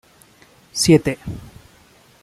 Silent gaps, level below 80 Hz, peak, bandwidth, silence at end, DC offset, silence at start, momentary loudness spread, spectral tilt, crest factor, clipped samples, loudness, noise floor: none; -46 dBFS; -2 dBFS; 15 kHz; 0.75 s; under 0.1%; 0.75 s; 19 LU; -5 dB/octave; 20 dB; under 0.1%; -18 LUFS; -51 dBFS